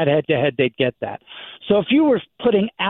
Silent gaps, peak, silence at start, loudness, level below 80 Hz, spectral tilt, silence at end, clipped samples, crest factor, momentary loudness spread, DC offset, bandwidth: none; -4 dBFS; 0 s; -19 LUFS; -56 dBFS; -10.5 dB/octave; 0 s; under 0.1%; 14 dB; 16 LU; under 0.1%; 4.1 kHz